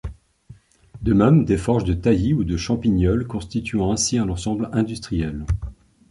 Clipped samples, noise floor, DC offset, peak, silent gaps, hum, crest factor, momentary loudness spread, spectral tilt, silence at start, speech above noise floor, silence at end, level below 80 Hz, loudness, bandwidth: under 0.1%; -48 dBFS; under 0.1%; -4 dBFS; none; none; 16 dB; 10 LU; -6 dB/octave; 0.05 s; 28 dB; 0.35 s; -34 dBFS; -21 LUFS; 11.5 kHz